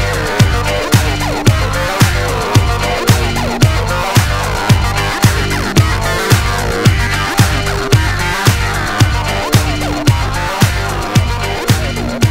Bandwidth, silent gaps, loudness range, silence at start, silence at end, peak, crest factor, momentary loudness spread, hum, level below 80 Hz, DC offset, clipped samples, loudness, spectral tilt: 16.5 kHz; none; 1 LU; 0 s; 0 s; 0 dBFS; 12 dB; 3 LU; 50 Hz at -30 dBFS; -22 dBFS; 1%; 0.2%; -13 LUFS; -4.5 dB/octave